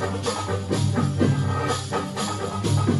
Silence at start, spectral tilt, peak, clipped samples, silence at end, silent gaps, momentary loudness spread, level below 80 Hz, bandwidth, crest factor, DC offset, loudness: 0 s; -5.5 dB/octave; -6 dBFS; under 0.1%; 0 s; none; 5 LU; -50 dBFS; 12 kHz; 16 dB; under 0.1%; -24 LUFS